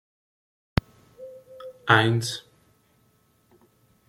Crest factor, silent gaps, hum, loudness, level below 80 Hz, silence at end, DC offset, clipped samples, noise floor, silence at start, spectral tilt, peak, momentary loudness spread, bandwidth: 26 dB; none; none; -24 LUFS; -48 dBFS; 1.7 s; under 0.1%; under 0.1%; -64 dBFS; 1.2 s; -5 dB/octave; -2 dBFS; 26 LU; 16 kHz